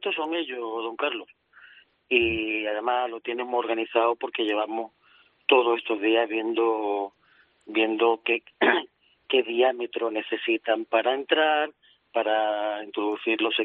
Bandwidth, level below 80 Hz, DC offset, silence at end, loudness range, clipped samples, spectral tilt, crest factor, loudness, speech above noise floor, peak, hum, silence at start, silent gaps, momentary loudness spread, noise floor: 4.1 kHz; -64 dBFS; under 0.1%; 0 s; 3 LU; under 0.1%; 0 dB/octave; 20 dB; -25 LUFS; 37 dB; -6 dBFS; none; 0 s; none; 9 LU; -62 dBFS